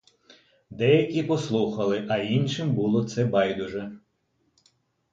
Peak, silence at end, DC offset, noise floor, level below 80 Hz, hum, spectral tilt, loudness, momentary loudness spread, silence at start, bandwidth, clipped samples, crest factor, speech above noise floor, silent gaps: -8 dBFS; 1.15 s; under 0.1%; -72 dBFS; -62 dBFS; none; -6.5 dB/octave; -25 LUFS; 9 LU; 0.7 s; 7.8 kHz; under 0.1%; 18 dB; 47 dB; none